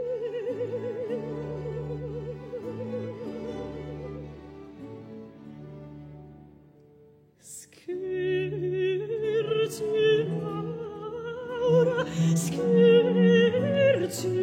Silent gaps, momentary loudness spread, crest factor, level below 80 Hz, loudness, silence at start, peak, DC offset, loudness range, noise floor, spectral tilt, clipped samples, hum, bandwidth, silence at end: none; 23 LU; 18 dB; -58 dBFS; -27 LUFS; 0 s; -10 dBFS; under 0.1%; 20 LU; -57 dBFS; -6 dB/octave; under 0.1%; none; 16 kHz; 0 s